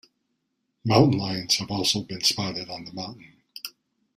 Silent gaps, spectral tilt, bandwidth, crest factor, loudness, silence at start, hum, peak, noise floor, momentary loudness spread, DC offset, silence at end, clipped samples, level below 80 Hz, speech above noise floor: none; -4.5 dB/octave; 15.5 kHz; 22 dB; -23 LUFS; 0.85 s; none; -4 dBFS; -77 dBFS; 19 LU; under 0.1%; 0.45 s; under 0.1%; -56 dBFS; 52 dB